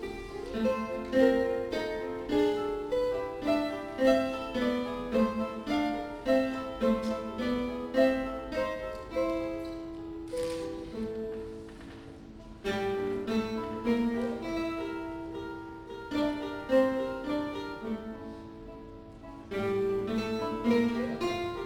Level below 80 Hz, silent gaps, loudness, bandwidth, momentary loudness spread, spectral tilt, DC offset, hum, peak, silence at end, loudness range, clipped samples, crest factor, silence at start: -52 dBFS; none; -31 LUFS; 17.5 kHz; 16 LU; -6 dB/octave; under 0.1%; none; -12 dBFS; 0 s; 6 LU; under 0.1%; 20 dB; 0 s